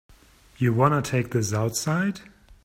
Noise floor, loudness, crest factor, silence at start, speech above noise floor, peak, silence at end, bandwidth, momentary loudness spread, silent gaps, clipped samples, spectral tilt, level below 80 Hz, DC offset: -54 dBFS; -24 LUFS; 20 dB; 0.6 s; 30 dB; -6 dBFS; 0.1 s; 16 kHz; 6 LU; none; under 0.1%; -5.5 dB/octave; -54 dBFS; under 0.1%